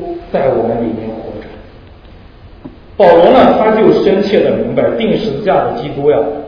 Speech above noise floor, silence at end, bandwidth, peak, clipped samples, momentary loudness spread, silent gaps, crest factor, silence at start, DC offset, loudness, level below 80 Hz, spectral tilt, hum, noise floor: 26 dB; 0 s; 5.4 kHz; 0 dBFS; 0.5%; 16 LU; none; 12 dB; 0 s; under 0.1%; -11 LUFS; -38 dBFS; -8 dB/octave; none; -36 dBFS